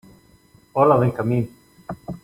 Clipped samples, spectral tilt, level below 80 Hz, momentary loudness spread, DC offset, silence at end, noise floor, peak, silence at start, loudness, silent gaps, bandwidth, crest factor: under 0.1%; -9.5 dB/octave; -54 dBFS; 19 LU; under 0.1%; 0.05 s; -54 dBFS; -4 dBFS; 0.75 s; -19 LUFS; none; 16 kHz; 20 dB